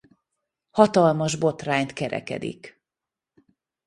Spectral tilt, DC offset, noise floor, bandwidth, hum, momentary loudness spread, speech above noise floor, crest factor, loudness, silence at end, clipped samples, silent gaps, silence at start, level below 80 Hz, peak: -5.5 dB/octave; under 0.1%; -89 dBFS; 11.5 kHz; none; 14 LU; 66 dB; 24 dB; -23 LUFS; 1.15 s; under 0.1%; none; 0.75 s; -62 dBFS; -2 dBFS